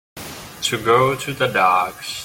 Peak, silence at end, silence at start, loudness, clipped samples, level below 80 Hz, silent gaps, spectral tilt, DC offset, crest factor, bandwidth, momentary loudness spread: -2 dBFS; 0 s; 0.15 s; -18 LUFS; under 0.1%; -52 dBFS; none; -3.5 dB/octave; under 0.1%; 18 dB; 17 kHz; 17 LU